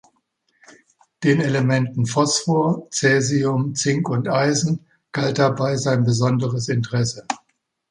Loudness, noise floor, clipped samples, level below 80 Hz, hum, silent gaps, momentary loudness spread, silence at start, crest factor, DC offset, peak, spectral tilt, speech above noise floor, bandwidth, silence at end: -20 LUFS; -70 dBFS; under 0.1%; -58 dBFS; none; none; 6 LU; 1.2 s; 18 dB; under 0.1%; -2 dBFS; -5 dB/octave; 50 dB; 11 kHz; 0.55 s